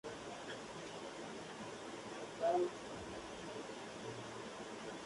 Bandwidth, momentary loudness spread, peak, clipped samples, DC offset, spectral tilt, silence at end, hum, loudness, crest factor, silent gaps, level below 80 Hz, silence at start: 11.5 kHz; 11 LU; -26 dBFS; under 0.1%; under 0.1%; -4 dB/octave; 0 s; none; -45 LUFS; 20 dB; none; -72 dBFS; 0.05 s